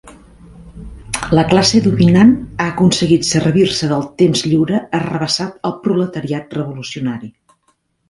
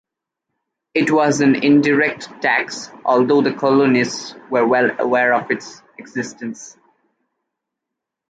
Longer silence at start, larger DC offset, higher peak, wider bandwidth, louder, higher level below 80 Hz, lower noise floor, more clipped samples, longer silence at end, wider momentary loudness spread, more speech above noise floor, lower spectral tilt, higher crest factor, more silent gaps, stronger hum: second, 0.05 s vs 0.95 s; neither; first, 0 dBFS vs -4 dBFS; first, 11.5 kHz vs 9.2 kHz; about the same, -15 LUFS vs -17 LUFS; first, -42 dBFS vs -66 dBFS; second, -62 dBFS vs -82 dBFS; neither; second, 0.8 s vs 1.6 s; about the same, 12 LU vs 14 LU; second, 48 dB vs 65 dB; about the same, -5.5 dB/octave vs -5 dB/octave; about the same, 16 dB vs 16 dB; neither; neither